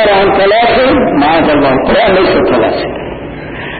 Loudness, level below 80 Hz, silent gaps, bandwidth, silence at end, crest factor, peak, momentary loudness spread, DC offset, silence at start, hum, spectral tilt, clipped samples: -9 LUFS; -32 dBFS; none; 4.8 kHz; 0 s; 8 dB; -2 dBFS; 14 LU; under 0.1%; 0 s; none; -11.5 dB/octave; under 0.1%